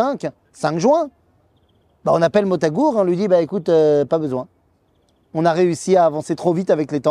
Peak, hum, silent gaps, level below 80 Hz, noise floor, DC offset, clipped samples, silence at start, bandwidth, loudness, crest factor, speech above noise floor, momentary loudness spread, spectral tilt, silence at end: -2 dBFS; none; none; -60 dBFS; -60 dBFS; under 0.1%; under 0.1%; 0 s; 11 kHz; -18 LUFS; 16 dB; 43 dB; 11 LU; -6.5 dB/octave; 0 s